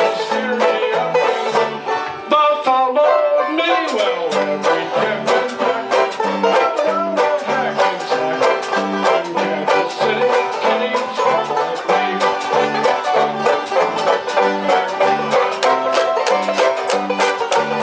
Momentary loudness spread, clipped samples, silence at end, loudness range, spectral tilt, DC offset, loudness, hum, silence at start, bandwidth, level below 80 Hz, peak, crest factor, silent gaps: 4 LU; under 0.1%; 0 s; 1 LU; -3.5 dB/octave; under 0.1%; -17 LUFS; none; 0 s; 8 kHz; -68 dBFS; -2 dBFS; 14 dB; none